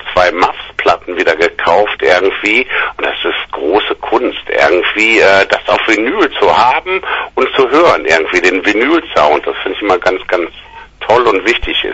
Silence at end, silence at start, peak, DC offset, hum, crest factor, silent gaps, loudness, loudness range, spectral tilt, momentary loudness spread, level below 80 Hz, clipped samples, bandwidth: 0 s; 0 s; 0 dBFS; under 0.1%; none; 12 dB; none; -11 LUFS; 2 LU; -3.5 dB/octave; 7 LU; -40 dBFS; 0.2%; 10 kHz